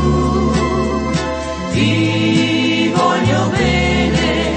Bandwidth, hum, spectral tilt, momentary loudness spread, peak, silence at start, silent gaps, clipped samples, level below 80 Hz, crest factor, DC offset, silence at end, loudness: 8.8 kHz; none; -5.5 dB/octave; 5 LU; -2 dBFS; 0 s; none; under 0.1%; -28 dBFS; 12 dB; under 0.1%; 0 s; -15 LUFS